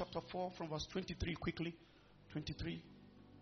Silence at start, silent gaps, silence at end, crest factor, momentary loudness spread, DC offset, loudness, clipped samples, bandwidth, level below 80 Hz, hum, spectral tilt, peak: 0 s; none; 0 s; 18 dB; 19 LU; under 0.1%; -45 LUFS; under 0.1%; 6.4 kHz; -58 dBFS; none; -4.5 dB/octave; -28 dBFS